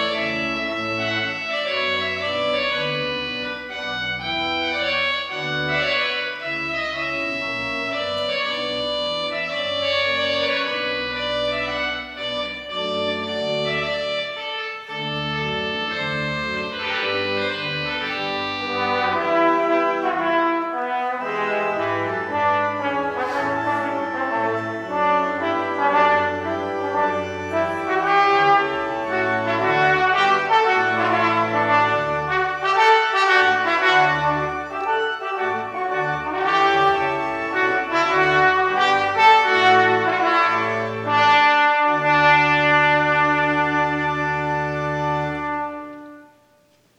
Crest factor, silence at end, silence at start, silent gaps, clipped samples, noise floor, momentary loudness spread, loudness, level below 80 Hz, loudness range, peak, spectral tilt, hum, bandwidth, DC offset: 18 dB; 0.75 s; 0 s; none; under 0.1%; -58 dBFS; 9 LU; -20 LUFS; -52 dBFS; 7 LU; -2 dBFS; -4.5 dB/octave; none; 10.5 kHz; under 0.1%